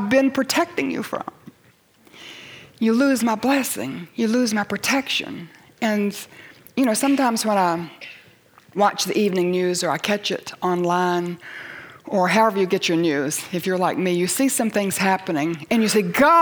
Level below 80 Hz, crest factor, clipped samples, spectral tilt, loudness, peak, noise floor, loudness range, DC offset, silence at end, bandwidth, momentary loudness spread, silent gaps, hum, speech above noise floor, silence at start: -64 dBFS; 16 dB; under 0.1%; -4 dB/octave; -21 LUFS; -6 dBFS; -56 dBFS; 3 LU; under 0.1%; 0 s; over 20 kHz; 17 LU; none; none; 36 dB; 0 s